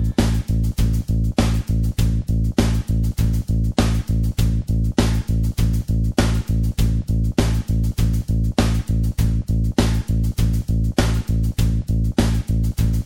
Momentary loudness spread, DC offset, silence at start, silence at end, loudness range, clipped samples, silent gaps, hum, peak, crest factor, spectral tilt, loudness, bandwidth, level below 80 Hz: 2 LU; under 0.1%; 0 s; 0 s; 0 LU; under 0.1%; none; none; -2 dBFS; 16 dB; -6.5 dB/octave; -21 LUFS; 17 kHz; -22 dBFS